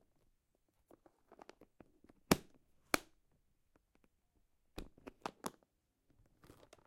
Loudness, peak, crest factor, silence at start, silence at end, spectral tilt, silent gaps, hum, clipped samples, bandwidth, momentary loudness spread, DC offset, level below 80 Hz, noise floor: -41 LUFS; -10 dBFS; 38 dB; 2.3 s; 1.4 s; -4 dB/octave; none; none; under 0.1%; 16 kHz; 25 LU; under 0.1%; -66 dBFS; -80 dBFS